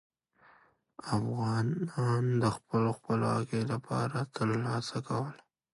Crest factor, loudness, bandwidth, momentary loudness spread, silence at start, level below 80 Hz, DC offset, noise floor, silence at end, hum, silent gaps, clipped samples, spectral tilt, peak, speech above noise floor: 16 dB; -32 LUFS; 11.5 kHz; 5 LU; 1.05 s; -64 dBFS; under 0.1%; -65 dBFS; 0.4 s; none; none; under 0.1%; -7 dB/octave; -16 dBFS; 33 dB